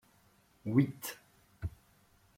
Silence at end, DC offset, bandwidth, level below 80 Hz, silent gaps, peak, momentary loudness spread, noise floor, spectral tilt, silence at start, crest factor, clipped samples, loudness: 0.7 s; under 0.1%; 16.5 kHz; -58 dBFS; none; -14 dBFS; 15 LU; -67 dBFS; -6.5 dB/octave; 0.65 s; 24 dB; under 0.1%; -36 LUFS